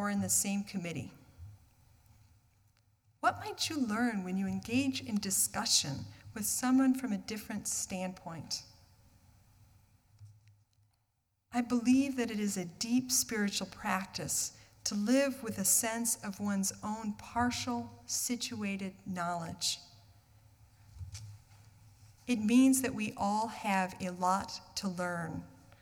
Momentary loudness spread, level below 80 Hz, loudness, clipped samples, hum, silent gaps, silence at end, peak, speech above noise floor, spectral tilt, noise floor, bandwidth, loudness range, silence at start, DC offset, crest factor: 12 LU; -66 dBFS; -33 LUFS; under 0.1%; none; none; 0.25 s; -14 dBFS; 46 dB; -3 dB/octave; -79 dBFS; 19 kHz; 9 LU; 0 s; under 0.1%; 22 dB